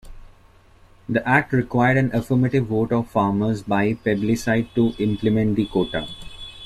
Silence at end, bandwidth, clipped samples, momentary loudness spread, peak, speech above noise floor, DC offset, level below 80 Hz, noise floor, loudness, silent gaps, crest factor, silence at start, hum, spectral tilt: 0 s; 13.5 kHz; under 0.1%; 7 LU; -4 dBFS; 31 dB; under 0.1%; -44 dBFS; -51 dBFS; -21 LUFS; none; 16 dB; 0.05 s; none; -7 dB/octave